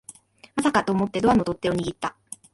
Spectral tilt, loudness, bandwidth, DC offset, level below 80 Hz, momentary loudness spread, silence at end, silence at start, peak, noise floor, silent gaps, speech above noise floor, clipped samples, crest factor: -5.5 dB/octave; -24 LUFS; 11.5 kHz; under 0.1%; -50 dBFS; 12 LU; 0.45 s; 0.1 s; -8 dBFS; -48 dBFS; none; 26 dB; under 0.1%; 18 dB